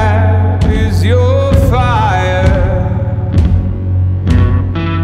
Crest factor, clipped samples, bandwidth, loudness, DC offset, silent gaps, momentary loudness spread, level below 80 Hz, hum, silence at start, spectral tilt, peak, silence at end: 10 dB; under 0.1%; 9.6 kHz; -12 LUFS; under 0.1%; none; 4 LU; -18 dBFS; none; 0 s; -7.5 dB/octave; 0 dBFS; 0 s